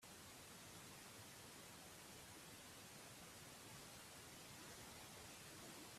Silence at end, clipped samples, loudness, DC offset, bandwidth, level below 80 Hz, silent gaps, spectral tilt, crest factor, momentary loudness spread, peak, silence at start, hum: 0 s; under 0.1%; -58 LUFS; under 0.1%; 15.5 kHz; -78 dBFS; none; -2.5 dB/octave; 14 dB; 2 LU; -44 dBFS; 0 s; none